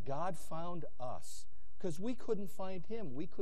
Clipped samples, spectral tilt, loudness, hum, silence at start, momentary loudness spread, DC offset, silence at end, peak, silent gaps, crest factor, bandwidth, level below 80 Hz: under 0.1%; -6 dB/octave; -44 LUFS; none; 0 s; 7 LU; 3%; 0 s; -22 dBFS; none; 18 dB; 13 kHz; -64 dBFS